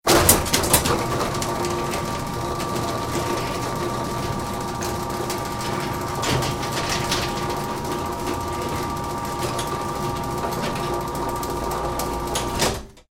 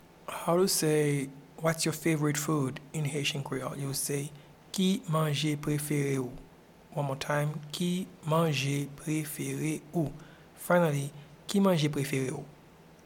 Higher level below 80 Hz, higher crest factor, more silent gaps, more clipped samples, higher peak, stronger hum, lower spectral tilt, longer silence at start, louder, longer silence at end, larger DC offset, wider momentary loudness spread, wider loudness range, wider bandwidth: first, -38 dBFS vs -62 dBFS; about the same, 24 dB vs 20 dB; neither; neither; first, 0 dBFS vs -12 dBFS; neither; second, -3.5 dB/octave vs -5 dB/octave; second, 0.05 s vs 0.3 s; first, -24 LUFS vs -30 LUFS; second, 0.1 s vs 0.5 s; first, 0.1% vs under 0.1%; second, 9 LU vs 12 LU; about the same, 3 LU vs 3 LU; about the same, 17 kHz vs 18 kHz